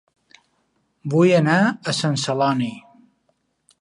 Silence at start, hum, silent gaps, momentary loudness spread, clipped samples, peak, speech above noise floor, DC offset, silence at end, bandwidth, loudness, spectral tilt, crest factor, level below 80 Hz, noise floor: 1.05 s; none; none; 10 LU; under 0.1%; -4 dBFS; 50 dB; under 0.1%; 1 s; 11.5 kHz; -19 LUFS; -5.5 dB/octave; 18 dB; -68 dBFS; -68 dBFS